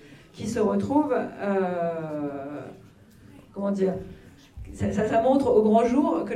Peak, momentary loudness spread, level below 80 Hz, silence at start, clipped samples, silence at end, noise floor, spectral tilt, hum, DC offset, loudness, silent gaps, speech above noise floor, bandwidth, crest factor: -8 dBFS; 19 LU; -52 dBFS; 0.05 s; under 0.1%; 0 s; -51 dBFS; -7.5 dB/octave; none; under 0.1%; -24 LUFS; none; 27 dB; 12.5 kHz; 18 dB